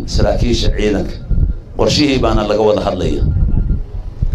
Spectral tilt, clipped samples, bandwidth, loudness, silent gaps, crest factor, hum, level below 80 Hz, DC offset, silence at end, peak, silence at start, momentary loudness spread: -6 dB/octave; under 0.1%; 10.5 kHz; -16 LUFS; none; 14 dB; none; -18 dBFS; under 0.1%; 0 s; 0 dBFS; 0 s; 8 LU